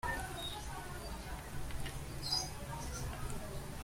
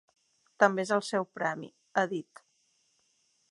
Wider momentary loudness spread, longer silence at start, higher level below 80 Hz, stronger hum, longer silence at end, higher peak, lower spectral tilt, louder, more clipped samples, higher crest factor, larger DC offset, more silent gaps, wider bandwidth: about the same, 9 LU vs 9 LU; second, 0.05 s vs 0.6 s; first, -48 dBFS vs -86 dBFS; neither; second, 0 s vs 1.3 s; second, -22 dBFS vs -6 dBFS; about the same, -3.5 dB/octave vs -4.5 dB/octave; second, -42 LUFS vs -30 LUFS; neither; second, 18 dB vs 26 dB; neither; neither; first, 16.5 kHz vs 11.5 kHz